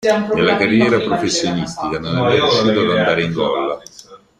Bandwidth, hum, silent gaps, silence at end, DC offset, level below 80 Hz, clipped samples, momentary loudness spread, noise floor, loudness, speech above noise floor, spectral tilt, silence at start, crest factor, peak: 11.5 kHz; none; none; 0.25 s; under 0.1%; -48 dBFS; under 0.1%; 8 LU; -42 dBFS; -16 LUFS; 26 dB; -4.5 dB/octave; 0 s; 14 dB; -2 dBFS